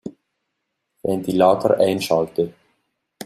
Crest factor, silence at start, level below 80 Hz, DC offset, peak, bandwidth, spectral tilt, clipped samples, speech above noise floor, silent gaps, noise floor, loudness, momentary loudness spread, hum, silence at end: 20 dB; 0.05 s; -60 dBFS; under 0.1%; -2 dBFS; 15 kHz; -6 dB/octave; under 0.1%; 59 dB; none; -77 dBFS; -19 LUFS; 12 LU; none; 0 s